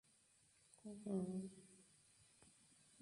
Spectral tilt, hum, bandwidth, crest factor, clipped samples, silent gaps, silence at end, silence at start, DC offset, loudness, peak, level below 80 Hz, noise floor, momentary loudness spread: -7 dB/octave; none; 11.5 kHz; 20 dB; under 0.1%; none; 0 s; 0.85 s; under 0.1%; -49 LUFS; -32 dBFS; -84 dBFS; -75 dBFS; 24 LU